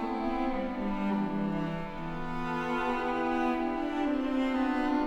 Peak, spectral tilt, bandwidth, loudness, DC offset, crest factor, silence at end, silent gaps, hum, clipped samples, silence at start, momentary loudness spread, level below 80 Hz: -18 dBFS; -7 dB/octave; 9.4 kHz; -31 LUFS; under 0.1%; 12 dB; 0 s; none; none; under 0.1%; 0 s; 6 LU; -46 dBFS